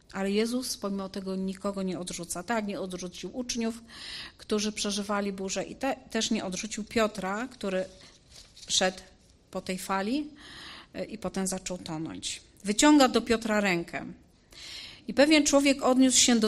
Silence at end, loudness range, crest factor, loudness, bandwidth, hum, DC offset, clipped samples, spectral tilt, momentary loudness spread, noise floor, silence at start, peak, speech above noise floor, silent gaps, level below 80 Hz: 0 s; 8 LU; 20 dB; -28 LUFS; 14.5 kHz; none; under 0.1%; under 0.1%; -3 dB/octave; 19 LU; -53 dBFS; 0.15 s; -8 dBFS; 25 dB; none; -56 dBFS